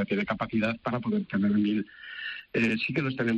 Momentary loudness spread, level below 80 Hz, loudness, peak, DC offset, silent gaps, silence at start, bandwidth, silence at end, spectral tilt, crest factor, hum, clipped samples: 10 LU; -62 dBFS; -28 LUFS; -16 dBFS; under 0.1%; none; 0 s; 7.8 kHz; 0 s; -7.5 dB/octave; 12 dB; none; under 0.1%